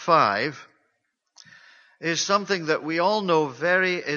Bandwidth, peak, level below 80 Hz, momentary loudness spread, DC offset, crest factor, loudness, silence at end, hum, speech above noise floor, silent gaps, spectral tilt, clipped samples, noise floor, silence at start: 7.4 kHz; -4 dBFS; -72 dBFS; 7 LU; under 0.1%; 20 dB; -23 LUFS; 0 s; none; 52 dB; none; -3.5 dB/octave; under 0.1%; -75 dBFS; 0 s